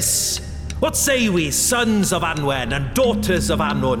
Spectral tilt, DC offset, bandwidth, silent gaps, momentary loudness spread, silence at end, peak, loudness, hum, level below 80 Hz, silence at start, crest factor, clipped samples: -3.5 dB/octave; under 0.1%; 18 kHz; none; 5 LU; 0 s; -8 dBFS; -19 LUFS; none; -34 dBFS; 0 s; 10 dB; under 0.1%